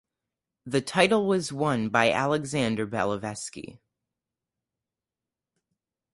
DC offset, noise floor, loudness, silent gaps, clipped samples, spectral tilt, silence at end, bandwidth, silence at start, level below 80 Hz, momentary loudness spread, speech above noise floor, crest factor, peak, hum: under 0.1%; -90 dBFS; -25 LUFS; none; under 0.1%; -4.5 dB/octave; 2.4 s; 11.5 kHz; 0.65 s; -62 dBFS; 14 LU; 64 dB; 24 dB; -4 dBFS; none